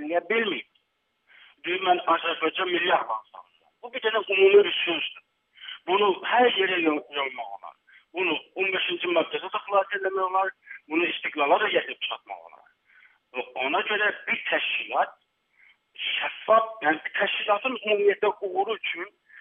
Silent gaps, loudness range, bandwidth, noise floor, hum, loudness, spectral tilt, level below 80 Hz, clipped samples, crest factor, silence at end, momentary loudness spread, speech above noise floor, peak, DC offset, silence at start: none; 5 LU; 3.8 kHz; -74 dBFS; none; -25 LUFS; -6.5 dB/octave; -88 dBFS; under 0.1%; 20 dB; 0 s; 13 LU; 49 dB; -6 dBFS; under 0.1%; 0 s